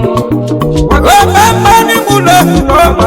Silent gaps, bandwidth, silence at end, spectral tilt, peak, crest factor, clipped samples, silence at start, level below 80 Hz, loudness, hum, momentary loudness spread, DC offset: none; over 20 kHz; 0 s; -4.5 dB/octave; 0 dBFS; 6 dB; 3%; 0 s; -18 dBFS; -7 LUFS; none; 7 LU; under 0.1%